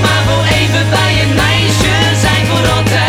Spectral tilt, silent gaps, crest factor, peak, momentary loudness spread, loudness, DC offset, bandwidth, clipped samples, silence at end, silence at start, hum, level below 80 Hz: -4.5 dB/octave; none; 10 dB; 0 dBFS; 1 LU; -10 LUFS; under 0.1%; 16 kHz; under 0.1%; 0 s; 0 s; none; -26 dBFS